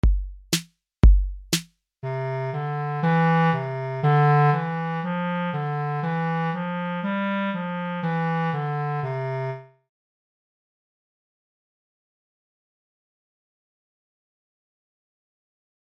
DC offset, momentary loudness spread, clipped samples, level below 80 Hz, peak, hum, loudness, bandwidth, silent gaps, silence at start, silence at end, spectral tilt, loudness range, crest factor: under 0.1%; 10 LU; under 0.1%; -30 dBFS; -4 dBFS; none; -24 LUFS; 16 kHz; none; 0.05 s; 6.35 s; -6 dB/octave; 9 LU; 20 dB